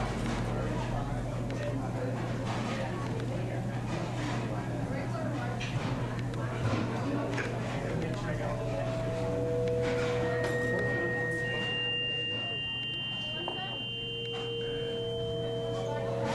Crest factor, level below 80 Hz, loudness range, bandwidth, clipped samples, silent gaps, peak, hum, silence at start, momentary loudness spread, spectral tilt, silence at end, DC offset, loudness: 14 dB; -48 dBFS; 4 LU; 12.5 kHz; under 0.1%; none; -18 dBFS; none; 0 s; 4 LU; -6 dB/octave; 0 s; under 0.1%; -33 LUFS